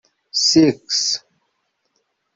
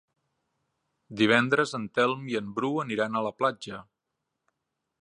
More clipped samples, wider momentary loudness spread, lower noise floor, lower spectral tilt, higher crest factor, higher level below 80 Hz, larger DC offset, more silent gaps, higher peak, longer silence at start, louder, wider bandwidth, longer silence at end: neither; second, 11 LU vs 17 LU; second, -71 dBFS vs -83 dBFS; second, -3 dB/octave vs -5 dB/octave; second, 18 dB vs 24 dB; first, -60 dBFS vs -72 dBFS; neither; neither; about the same, -2 dBFS vs -4 dBFS; second, 0.35 s vs 1.1 s; first, -17 LUFS vs -27 LUFS; second, 7.8 kHz vs 11 kHz; about the same, 1.2 s vs 1.2 s